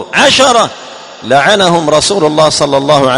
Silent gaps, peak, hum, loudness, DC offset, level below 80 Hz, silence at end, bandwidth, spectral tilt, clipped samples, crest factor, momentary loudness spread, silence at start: none; 0 dBFS; none; -8 LUFS; 0.2%; -44 dBFS; 0 s; 13.5 kHz; -3 dB/octave; 1%; 8 dB; 13 LU; 0 s